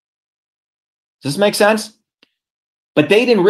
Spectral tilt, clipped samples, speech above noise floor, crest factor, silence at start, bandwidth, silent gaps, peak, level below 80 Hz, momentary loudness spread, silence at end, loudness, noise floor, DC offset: -4.5 dB/octave; under 0.1%; 47 dB; 18 dB; 1.25 s; 16 kHz; 2.50-2.95 s; 0 dBFS; -66 dBFS; 14 LU; 0 s; -15 LUFS; -60 dBFS; under 0.1%